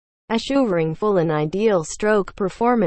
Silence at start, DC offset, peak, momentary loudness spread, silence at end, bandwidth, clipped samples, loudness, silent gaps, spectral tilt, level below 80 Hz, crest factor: 0.3 s; under 0.1%; -6 dBFS; 4 LU; 0 s; 8.8 kHz; under 0.1%; -20 LUFS; none; -6 dB/octave; -48 dBFS; 14 dB